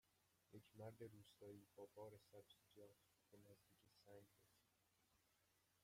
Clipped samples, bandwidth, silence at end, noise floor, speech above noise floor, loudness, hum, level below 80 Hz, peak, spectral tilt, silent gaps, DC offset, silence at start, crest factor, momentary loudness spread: under 0.1%; 16 kHz; 0 s; -84 dBFS; 20 dB; -64 LUFS; none; under -90 dBFS; -46 dBFS; -6 dB/octave; none; under 0.1%; 0.05 s; 20 dB; 9 LU